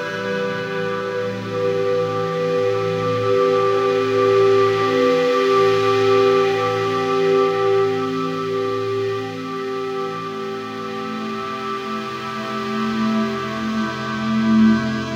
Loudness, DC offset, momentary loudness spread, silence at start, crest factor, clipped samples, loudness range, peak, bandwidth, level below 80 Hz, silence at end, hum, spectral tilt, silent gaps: -20 LUFS; under 0.1%; 11 LU; 0 s; 14 dB; under 0.1%; 9 LU; -6 dBFS; 10.5 kHz; -58 dBFS; 0 s; none; -6 dB/octave; none